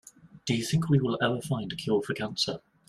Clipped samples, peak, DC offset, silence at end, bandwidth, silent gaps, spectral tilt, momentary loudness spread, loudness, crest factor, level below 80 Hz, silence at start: under 0.1%; -10 dBFS; under 0.1%; 0.3 s; 13 kHz; none; -5.5 dB/octave; 7 LU; -29 LUFS; 20 dB; -60 dBFS; 0.35 s